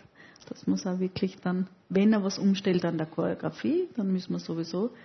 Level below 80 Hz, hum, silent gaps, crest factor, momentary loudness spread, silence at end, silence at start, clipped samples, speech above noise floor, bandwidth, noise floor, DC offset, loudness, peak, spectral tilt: -70 dBFS; none; none; 14 dB; 8 LU; 0 s; 0.2 s; under 0.1%; 25 dB; 6.4 kHz; -53 dBFS; under 0.1%; -29 LUFS; -14 dBFS; -6.5 dB/octave